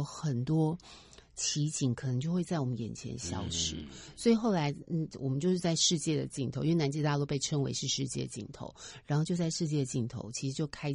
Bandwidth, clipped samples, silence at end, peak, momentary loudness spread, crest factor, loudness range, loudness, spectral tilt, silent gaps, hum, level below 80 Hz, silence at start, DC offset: 11.5 kHz; under 0.1%; 0 s; -14 dBFS; 12 LU; 18 dB; 4 LU; -32 LUFS; -5 dB/octave; none; none; -58 dBFS; 0 s; under 0.1%